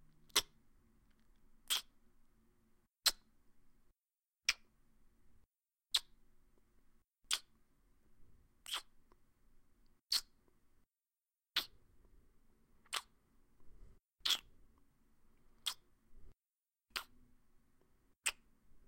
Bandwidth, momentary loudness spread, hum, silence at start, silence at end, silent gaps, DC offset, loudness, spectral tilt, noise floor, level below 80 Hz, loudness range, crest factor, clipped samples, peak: 16 kHz; 11 LU; none; 0.35 s; 0.1 s; none; under 0.1%; -40 LUFS; 2 dB/octave; under -90 dBFS; -68 dBFS; 5 LU; 32 dB; under 0.1%; -16 dBFS